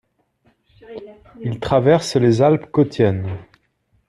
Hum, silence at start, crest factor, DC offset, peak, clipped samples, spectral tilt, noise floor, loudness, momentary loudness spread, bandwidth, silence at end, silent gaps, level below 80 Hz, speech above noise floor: none; 0.9 s; 18 dB; under 0.1%; -2 dBFS; under 0.1%; -7 dB/octave; -64 dBFS; -17 LUFS; 22 LU; 12 kHz; 0.65 s; none; -50 dBFS; 46 dB